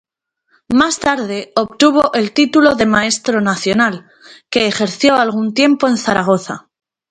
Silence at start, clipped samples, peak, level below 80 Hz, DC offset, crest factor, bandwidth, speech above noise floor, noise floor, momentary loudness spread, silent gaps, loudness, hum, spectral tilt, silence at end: 0.7 s; under 0.1%; 0 dBFS; -50 dBFS; under 0.1%; 14 dB; 10.5 kHz; 51 dB; -65 dBFS; 8 LU; none; -14 LUFS; none; -4 dB/octave; 0.5 s